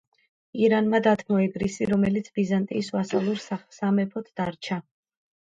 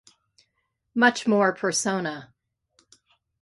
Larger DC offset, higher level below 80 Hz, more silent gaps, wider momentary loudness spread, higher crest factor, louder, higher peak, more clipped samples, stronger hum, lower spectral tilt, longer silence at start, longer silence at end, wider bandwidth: neither; first, -58 dBFS vs -72 dBFS; neither; about the same, 11 LU vs 12 LU; about the same, 18 dB vs 22 dB; about the same, -25 LUFS vs -23 LUFS; about the same, -8 dBFS vs -6 dBFS; neither; neither; first, -6.5 dB/octave vs -3.5 dB/octave; second, 0.55 s vs 0.95 s; second, 0.6 s vs 1.15 s; second, 7.8 kHz vs 11.5 kHz